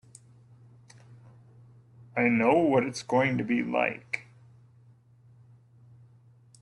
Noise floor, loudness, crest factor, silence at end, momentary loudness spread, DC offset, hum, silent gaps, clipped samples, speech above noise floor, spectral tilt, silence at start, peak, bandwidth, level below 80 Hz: -58 dBFS; -27 LUFS; 20 dB; 2.4 s; 13 LU; under 0.1%; none; none; under 0.1%; 33 dB; -6 dB/octave; 1.1 s; -10 dBFS; 11.5 kHz; -68 dBFS